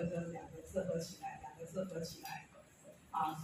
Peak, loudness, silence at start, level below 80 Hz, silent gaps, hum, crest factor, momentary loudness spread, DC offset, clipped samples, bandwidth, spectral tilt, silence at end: -24 dBFS; -44 LUFS; 0 s; -70 dBFS; none; none; 20 dB; 20 LU; under 0.1%; under 0.1%; 15.5 kHz; -5.5 dB/octave; 0 s